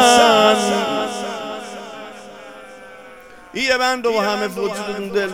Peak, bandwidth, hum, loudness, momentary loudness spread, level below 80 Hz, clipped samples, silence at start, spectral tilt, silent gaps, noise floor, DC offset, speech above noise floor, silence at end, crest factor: 0 dBFS; 17 kHz; none; -17 LUFS; 25 LU; -56 dBFS; under 0.1%; 0 s; -2.5 dB/octave; none; -41 dBFS; 0.2%; 21 dB; 0 s; 18 dB